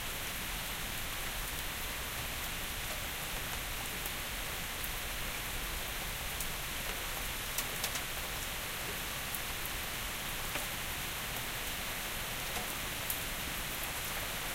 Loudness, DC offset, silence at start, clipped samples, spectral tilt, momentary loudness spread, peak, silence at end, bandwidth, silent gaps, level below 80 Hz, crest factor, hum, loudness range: -37 LUFS; under 0.1%; 0 s; under 0.1%; -1.5 dB/octave; 2 LU; -16 dBFS; 0 s; 17 kHz; none; -46 dBFS; 22 dB; none; 1 LU